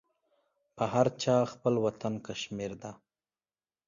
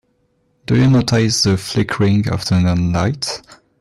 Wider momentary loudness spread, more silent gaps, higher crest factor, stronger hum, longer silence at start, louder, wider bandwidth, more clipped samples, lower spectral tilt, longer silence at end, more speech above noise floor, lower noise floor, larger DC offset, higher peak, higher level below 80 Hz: about the same, 11 LU vs 10 LU; neither; first, 22 dB vs 12 dB; neither; about the same, 0.75 s vs 0.7 s; second, -31 LUFS vs -16 LUFS; second, 7.4 kHz vs 13.5 kHz; neither; about the same, -6 dB/octave vs -5.5 dB/octave; first, 0.9 s vs 0.4 s; first, over 59 dB vs 47 dB; first, under -90 dBFS vs -62 dBFS; neither; second, -10 dBFS vs -6 dBFS; second, -68 dBFS vs -42 dBFS